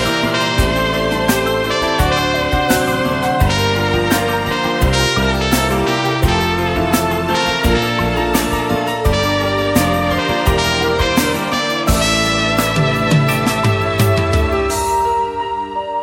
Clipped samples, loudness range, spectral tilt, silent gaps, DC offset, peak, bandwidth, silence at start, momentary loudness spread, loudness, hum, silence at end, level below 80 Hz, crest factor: under 0.1%; 1 LU; -4.5 dB/octave; none; under 0.1%; 0 dBFS; 17 kHz; 0 s; 3 LU; -15 LUFS; none; 0 s; -26 dBFS; 14 dB